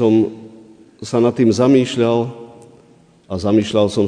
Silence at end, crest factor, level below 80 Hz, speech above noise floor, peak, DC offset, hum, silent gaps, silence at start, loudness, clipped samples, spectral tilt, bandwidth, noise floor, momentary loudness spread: 0 s; 14 dB; -54 dBFS; 35 dB; -2 dBFS; under 0.1%; none; none; 0 s; -16 LUFS; under 0.1%; -6.5 dB/octave; 10 kHz; -49 dBFS; 17 LU